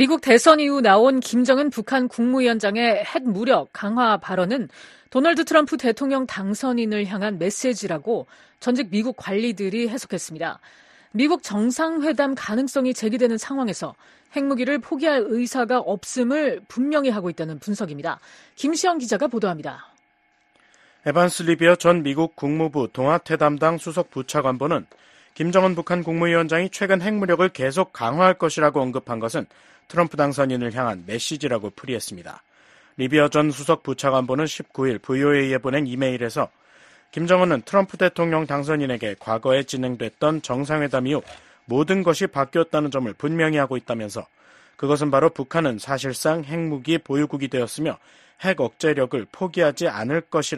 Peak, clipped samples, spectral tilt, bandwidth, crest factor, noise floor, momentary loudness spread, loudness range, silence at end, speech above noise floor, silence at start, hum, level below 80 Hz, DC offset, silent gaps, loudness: 0 dBFS; under 0.1%; -5 dB/octave; 13 kHz; 22 dB; -63 dBFS; 10 LU; 4 LU; 0 s; 42 dB; 0 s; none; -62 dBFS; under 0.1%; none; -22 LUFS